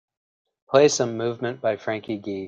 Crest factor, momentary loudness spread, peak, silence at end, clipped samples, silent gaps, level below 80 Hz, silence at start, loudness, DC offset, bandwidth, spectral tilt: 20 dB; 11 LU; -4 dBFS; 0 s; under 0.1%; none; -68 dBFS; 0.7 s; -23 LUFS; under 0.1%; 9.4 kHz; -4 dB/octave